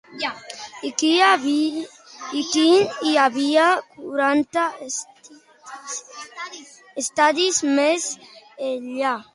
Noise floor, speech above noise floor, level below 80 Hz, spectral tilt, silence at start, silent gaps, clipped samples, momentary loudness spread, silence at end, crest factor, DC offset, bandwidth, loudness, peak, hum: -49 dBFS; 29 dB; -72 dBFS; -1.5 dB/octave; 0.1 s; none; under 0.1%; 19 LU; 0.1 s; 18 dB; under 0.1%; 11.5 kHz; -20 LUFS; -2 dBFS; none